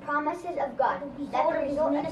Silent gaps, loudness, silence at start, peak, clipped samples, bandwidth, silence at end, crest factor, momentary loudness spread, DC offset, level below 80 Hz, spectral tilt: none; -28 LUFS; 0 s; -12 dBFS; under 0.1%; 11.5 kHz; 0 s; 16 dB; 5 LU; under 0.1%; -58 dBFS; -6.5 dB/octave